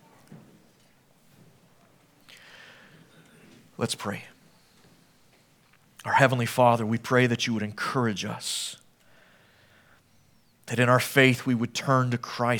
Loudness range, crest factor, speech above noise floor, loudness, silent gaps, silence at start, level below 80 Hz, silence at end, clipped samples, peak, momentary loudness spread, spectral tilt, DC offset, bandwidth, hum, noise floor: 13 LU; 26 dB; 37 dB; -25 LUFS; none; 0.3 s; -72 dBFS; 0 s; under 0.1%; -2 dBFS; 16 LU; -5 dB/octave; under 0.1%; 19 kHz; none; -61 dBFS